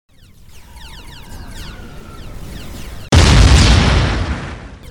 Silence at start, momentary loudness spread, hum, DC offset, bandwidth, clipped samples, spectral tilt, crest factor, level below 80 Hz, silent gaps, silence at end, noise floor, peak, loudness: 0.75 s; 26 LU; none; under 0.1%; 15 kHz; under 0.1%; -4.5 dB/octave; 14 dB; -18 dBFS; none; 0.05 s; -41 dBFS; 0 dBFS; -12 LUFS